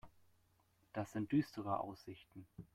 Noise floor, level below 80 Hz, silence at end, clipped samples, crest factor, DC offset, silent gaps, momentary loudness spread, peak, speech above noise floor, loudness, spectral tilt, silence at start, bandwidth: -75 dBFS; -74 dBFS; 0.1 s; under 0.1%; 20 dB; under 0.1%; none; 19 LU; -24 dBFS; 33 dB; -42 LUFS; -7.5 dB/octave; 0.05 s; 14.5 kHz